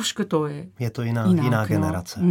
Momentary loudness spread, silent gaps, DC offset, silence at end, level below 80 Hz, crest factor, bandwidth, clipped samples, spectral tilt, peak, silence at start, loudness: 10 LU; none; under 0.1%; 0 s; -54 dBFS; 16 dB; 17 kHz; under 0.1%; -6 dB/octave; -6 dBFS; 0 s; -23 LUFS